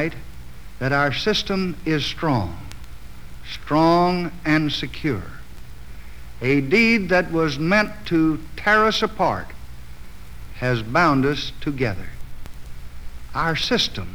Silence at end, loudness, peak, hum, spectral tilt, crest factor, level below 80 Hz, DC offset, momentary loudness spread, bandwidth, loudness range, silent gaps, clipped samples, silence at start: 0 s; -21 LUFS; -4 dBFS; none; -5.5 dB/octave; 18 dB; -38 dBFS; 2%; 25 LU; over 20 kHz; 5 LU; none; under 0.1%; 0 s